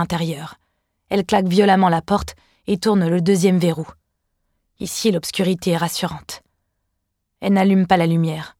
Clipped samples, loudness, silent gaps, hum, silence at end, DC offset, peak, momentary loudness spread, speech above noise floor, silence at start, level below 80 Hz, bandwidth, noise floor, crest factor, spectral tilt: under 0.1%; -18 LUFS; none; none; 0.1 s; under 0.1%; -2 dBFS; 17 LU; 57 dB; 0 s; -48 dBFS; 16 kHz; -74 dBFS; 18 dB; -6 dB/octave